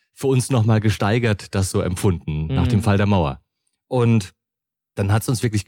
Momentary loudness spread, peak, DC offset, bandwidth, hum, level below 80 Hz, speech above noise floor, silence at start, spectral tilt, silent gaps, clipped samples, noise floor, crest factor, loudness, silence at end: 8 LU; -8 dBFS; under 0.1%; 16.5 kHz; none; -40 dBFS; 67 dB; 0.2 s; -6.5 dB/octave; none; under 0.1%; -86 dBFS; 12 dB; -20 LUFS; 0.05 s